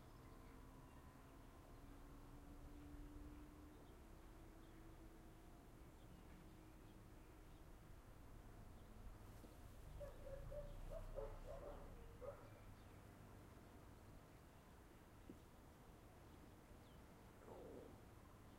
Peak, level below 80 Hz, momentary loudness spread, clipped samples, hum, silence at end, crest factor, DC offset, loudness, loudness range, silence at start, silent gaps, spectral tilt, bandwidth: -40 dBFS; -62 dBFS; 8 LU; under 0.1%; none; 0 s; 20 dB; under 0.1%; -62 LUFS; 7 LU; 0 s; none; -6 dB/octave; 16 kHz